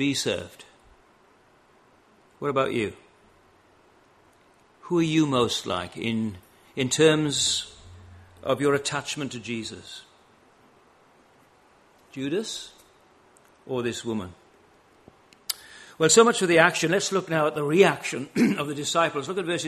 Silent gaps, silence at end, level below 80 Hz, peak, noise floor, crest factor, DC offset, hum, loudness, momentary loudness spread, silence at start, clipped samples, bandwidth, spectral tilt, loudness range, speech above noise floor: none; 0 s; -64 dBFS; -2 dBFS; -59 dBFS; 24 dB; under 0.1%; none; -24 LUFS; 17 LU; 0 s; under 0.1%; 13 kHz; -3.5 dB/octave; 15 LU; 35 dB